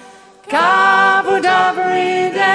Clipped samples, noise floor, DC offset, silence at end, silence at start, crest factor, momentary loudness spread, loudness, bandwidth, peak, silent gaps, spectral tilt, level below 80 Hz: under 0.1%; -39 dBFS; under 0.1%; 0 s; 0.45 s; 14 dB; 6 LU; -13 LUFS; 10.5 kHz; 0 dBFS; none; -3.5 dB/octave; -66 dBFS